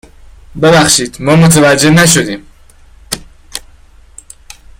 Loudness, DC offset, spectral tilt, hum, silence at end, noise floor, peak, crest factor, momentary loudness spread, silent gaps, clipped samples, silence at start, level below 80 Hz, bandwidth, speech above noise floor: -7 LUFS; under 0.1%; -4 dB/octave; none; 1.2 s; -39 dBFS; 0 dBFS; 12 dB; 20 LU; none; 0.1%; 0.55 s; -36 dBFS; 17 kHz; 32 dB